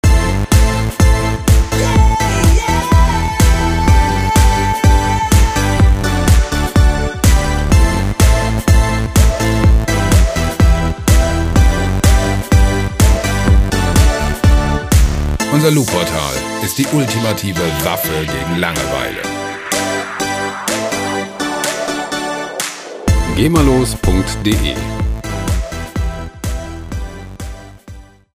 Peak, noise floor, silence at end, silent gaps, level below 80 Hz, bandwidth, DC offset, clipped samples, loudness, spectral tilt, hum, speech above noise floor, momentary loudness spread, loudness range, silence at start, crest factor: 0 dBFS; -36 dBFS; 0.3 s; none; -16 dBFS; 16 kHz; under 0.1%; under 0.1%; -14 LUFS; -5 dB/octave; none; 21 dB; 8 LU; 6 LU; 0.05 s; 12 dB